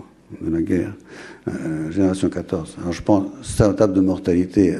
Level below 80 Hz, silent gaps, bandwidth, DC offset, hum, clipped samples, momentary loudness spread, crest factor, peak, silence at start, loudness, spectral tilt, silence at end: -42 dBFS; none; 12.5 kHz; under 0.1%; none; under 0.1%; 13 LU; 18 dB; -2 dBFS; 0 s; -21 LUFS; -7 dB/octave; 0 s